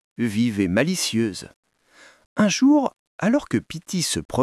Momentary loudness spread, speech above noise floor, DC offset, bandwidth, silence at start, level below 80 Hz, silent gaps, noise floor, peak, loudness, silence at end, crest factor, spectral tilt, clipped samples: 11 LU; 32 dB; under 0.1%; 12 kHz; 0.2 s; -56 dBFS; 1.56-1.63 s, 2.26-2.36 s, 2.99-3.19 s, 4.25-4.29 s; -53 dBFS; -4 dBFS; -22 LUFS; 0 s; 18 dB; -4.5 dB/octave; under 0.1%